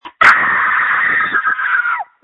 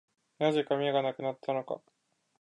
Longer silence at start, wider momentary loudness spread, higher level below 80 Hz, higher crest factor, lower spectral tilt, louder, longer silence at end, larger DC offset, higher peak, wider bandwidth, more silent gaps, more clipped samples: second, 0.05 s vs 0.4 s; second, 6 LU vs 9 LU; first, -56 dBFS vs -84 dBFS; about the same, 14 dB vs 18 dB; second, -2.5 dB/octave vs -6.5 dB/octave; first, -12 LUFS vs -31 LUFS; second, 0.2 s vs 0.65 s; neither; first, 0 dBFS vs -14 dBFS; about the same, 11 kHz vs 10.5 kHz; neither; first, 0.2% vs under 0.1%